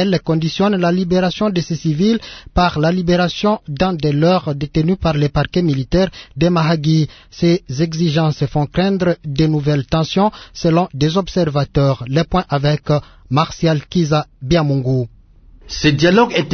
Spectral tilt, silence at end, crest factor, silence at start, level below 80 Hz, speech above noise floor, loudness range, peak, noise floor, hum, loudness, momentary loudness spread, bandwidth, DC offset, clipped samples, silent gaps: -6.5 dB/octave; 0 s; 16 dB; 0 s; -36 dBFS; 28 dB; 1 LU; 0 dBFS; -44 dBFS; none; -16 LUFS; 5 LU; 6.6 kHz; under 0.1%; under 0.1%; none